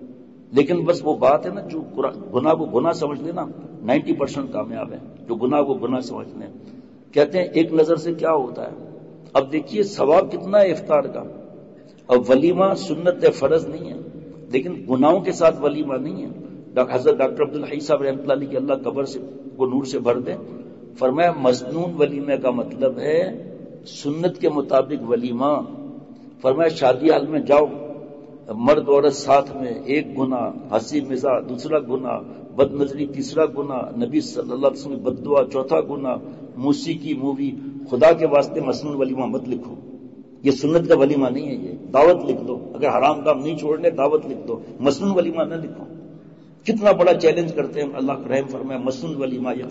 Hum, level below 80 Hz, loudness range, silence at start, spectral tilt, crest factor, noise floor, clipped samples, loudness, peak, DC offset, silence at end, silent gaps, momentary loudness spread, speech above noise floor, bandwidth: none; -60 dBFS; 4 LU; 0 s; -6.5 dB/octave; 16 dB; -44 dBFS; under 0.1%; -20 LUFS; -4 dBFS; 0.1%; 0 s; none; 16 LU; 25 dB; 8 kHz